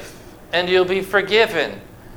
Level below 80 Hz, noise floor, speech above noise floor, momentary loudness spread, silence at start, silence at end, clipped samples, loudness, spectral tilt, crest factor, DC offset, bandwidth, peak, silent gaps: -48 dBFS; -39 dBFS; 21 dB; 15 LU; 0 s; 0 s; under 0.1%; -18 LUFS; -4.5 dB/octave; 18 dB; under 0.1%; over 20 kHz; -2 dBFS; none